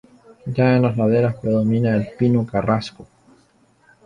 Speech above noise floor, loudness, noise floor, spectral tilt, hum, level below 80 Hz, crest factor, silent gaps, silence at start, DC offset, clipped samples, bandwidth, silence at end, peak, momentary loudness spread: 39 dB; -19 LUFS; -57 dBFS; -9 dB/octave; none; -50 dBFS; 14 dB; none; 0.45 s; under 0.1%; under 0.1%; 9.4 kHz; 1 s; -4 dBFS; 8 LU